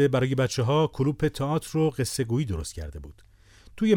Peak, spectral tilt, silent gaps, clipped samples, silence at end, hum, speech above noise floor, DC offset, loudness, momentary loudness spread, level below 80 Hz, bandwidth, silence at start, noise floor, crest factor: -8 dBFS; -6 dB/octave; none; under 0.1%; 0 s; none; 27 dB; under 0.1%; -26 LUFS; 12 LU; -44 dBFS; 17.5 kHz; 0 s; -52 dBFS; 16 dB